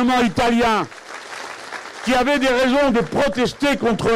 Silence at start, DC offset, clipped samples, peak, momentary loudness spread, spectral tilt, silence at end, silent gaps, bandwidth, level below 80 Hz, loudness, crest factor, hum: 0 s; under 0.1%; under 0.1%; -10 dBFS; 15 LU; -4.5 dB/octave; 0 s; none; 15.5 kHz; -42 dBFS; -18 LUFS; 8 dB; none